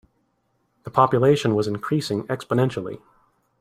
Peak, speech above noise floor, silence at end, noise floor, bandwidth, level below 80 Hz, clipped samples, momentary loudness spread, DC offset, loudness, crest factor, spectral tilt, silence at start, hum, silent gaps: -2 dBFS; 48 dB; 0.65 s; -69 dBFS; 15 kHz; -60 dBFS; under 0.1%; 16 LU; under 0.1%; -22 LUFS; 22 dB; -7 dB/octave; 0.85 s; none; none